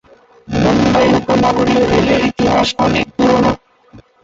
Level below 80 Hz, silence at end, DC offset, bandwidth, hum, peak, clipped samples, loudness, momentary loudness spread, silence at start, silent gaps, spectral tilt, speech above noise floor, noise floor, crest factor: -34 dBFS; 0.25 s; under 0.1%; 8 kHz; none; -2 dBFS; under 0.1%; -13 LUFS; 4 LU; 0.5 s; none; -6 dB/octave; 30 dB; -43 dBFS; 12 dB